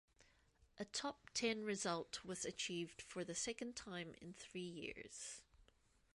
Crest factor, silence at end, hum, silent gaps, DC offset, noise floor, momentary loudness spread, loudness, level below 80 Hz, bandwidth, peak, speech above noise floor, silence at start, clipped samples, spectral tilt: 20 dB; 0.5 s; none; none; under 0.1%; -76 dBFS; 11 LU; -46 LUFS; -76 dBFS; 11.5 kHz; -28 dBFS; 28 dB; 0.2 s; under 0.1%; -3 dB/octave